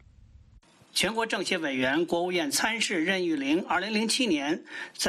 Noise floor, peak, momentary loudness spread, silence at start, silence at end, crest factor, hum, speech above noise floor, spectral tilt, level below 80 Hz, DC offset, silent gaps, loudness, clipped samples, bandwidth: -57 dBFS; -12 dBFS; 4 LU; 0.95 s; 0 s; 16 dB; none; 29 dB; -2.5 dB/octave; -62 dBFS; under 0.1%; none; -27 LUFS; under 0.1%; 14.5 kHz